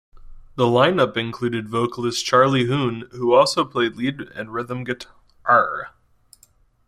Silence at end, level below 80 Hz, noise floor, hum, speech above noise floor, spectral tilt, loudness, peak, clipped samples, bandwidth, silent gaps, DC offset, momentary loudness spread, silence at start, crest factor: 1 s; -52 dBFS; -57 dBFS; none; 37 dB; -5 dB/octave; -20 LUFS; -2 dBFS; under 0.1%; 14 kHz; none; under 0.1%; 14 LU; 0.2 s; 18 dB